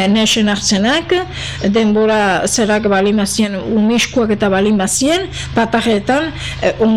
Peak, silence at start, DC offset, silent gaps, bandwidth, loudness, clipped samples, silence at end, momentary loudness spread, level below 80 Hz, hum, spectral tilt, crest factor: -4 dBFS; 0 s; 0.8%; none; 14 kHz; -14 LUFS; under 0.1%; 0 s; 5 LU; -36 dBFS; none; -4 dB/octave; 10 dB